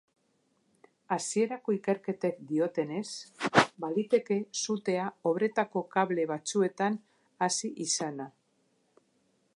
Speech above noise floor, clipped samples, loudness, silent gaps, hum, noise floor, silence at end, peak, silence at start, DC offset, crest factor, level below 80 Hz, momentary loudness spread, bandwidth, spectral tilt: 42 dB; under 0.1%; -31 LUFS; none; none; -73 dBFS; 1.3 s; -8 dBFS; 1.1 s; under 0.1%; 24 dB; -76 dBFS; 8 LU; 11.5 kHz; -4 dB/octave